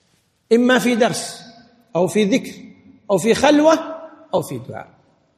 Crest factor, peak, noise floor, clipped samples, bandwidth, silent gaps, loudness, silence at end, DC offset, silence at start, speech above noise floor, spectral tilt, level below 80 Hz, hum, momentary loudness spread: 18 dB; -2 dBFS; -62 dBFS; under 0.1%; 15 kHz; none; -17 LUFS; 0.55 s; under 0.1%; 0.5 s; 46 dB; -4.5 dB/octave; -58 dBFS; none; 20 LU